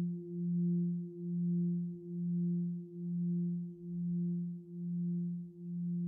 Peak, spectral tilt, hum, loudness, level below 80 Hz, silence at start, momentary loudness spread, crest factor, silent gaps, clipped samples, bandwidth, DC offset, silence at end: -28 dBFS; -17.5 dB/octave; none; -38 LUFS; -80 dBFS; 0 s; 8 LU; 8 dB; none; under 0.1%; 0.5 kHz; under 0.1%; 0 s